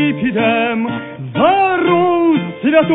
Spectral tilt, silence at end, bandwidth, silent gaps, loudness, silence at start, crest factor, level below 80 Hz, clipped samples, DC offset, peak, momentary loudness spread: -10 dB/octave; 0 s; 4.1 kHz; none; -14 LUFS; 0 s; 14 dB; -52 dBFS; under 0.1%; under 0.1%; 0 dBFS; 8 LU